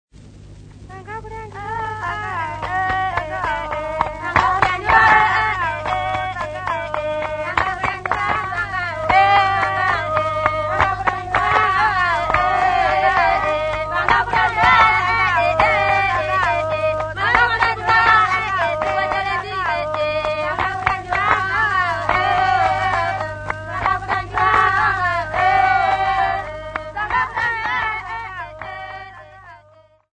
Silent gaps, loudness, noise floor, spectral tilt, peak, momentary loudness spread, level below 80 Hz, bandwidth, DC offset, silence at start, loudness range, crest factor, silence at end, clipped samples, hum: none; -18 LUFS; -51 dBFS; -4.5 dB/octave; 0 dBFS; 11 LU; -40 dBFS; 9.4 kHz; under 0.1%; 0.2 s; 6 LU; 18 dB; 0.6 s; under 0.1%; 50 Hz at -35 dBFS